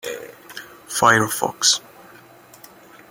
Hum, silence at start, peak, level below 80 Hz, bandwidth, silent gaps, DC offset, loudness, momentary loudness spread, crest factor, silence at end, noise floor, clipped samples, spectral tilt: none; 0.05 s; -2 dBFS; -62 dBFS; 17 kHz; none; under 0.1%; -18 LUFS; 22 LU; 22 dB; 1.3 s; -47 dBFS; under 0.1%; -1.5 dB/octave